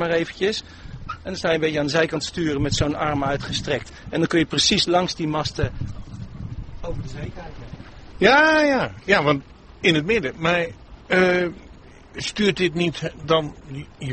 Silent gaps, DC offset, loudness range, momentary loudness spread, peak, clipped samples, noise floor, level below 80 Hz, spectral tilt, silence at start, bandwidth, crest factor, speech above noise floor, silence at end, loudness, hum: none; under 0.1%; 4 LU; 18 LU; -2 dBFS; under 0.1%; -44 dBFS; -42 dBFS; -4.5 dB/octave; 0 s; 8.8 kHz; 22 dB; 23 dB; 0 s; -21 LUFS; none